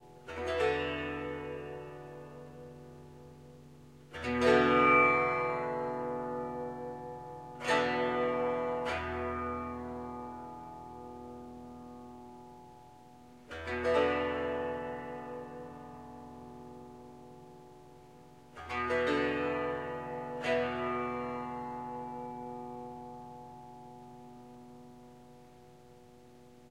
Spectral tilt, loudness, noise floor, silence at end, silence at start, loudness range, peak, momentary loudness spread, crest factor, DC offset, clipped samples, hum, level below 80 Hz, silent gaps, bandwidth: -5.5 dB/octave; -33 LUFS; -57 dBFS; 0 s; 0 s; 19 LU; -12 dBFS; 23 LU; 22 dB; under 0.1%; under 0.1%; none; -60 dBFS; none; 12 kHz